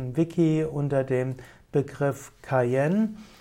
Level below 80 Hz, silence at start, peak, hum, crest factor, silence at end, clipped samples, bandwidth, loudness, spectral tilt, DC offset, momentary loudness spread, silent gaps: -58 dBFS; 0 s; -12 dBFS; none; 14 dB; 0.15 s; under 0.1%; 16 kHz; -26 LUFS; -8 dB/octave; under 0.1%; 7 LU; none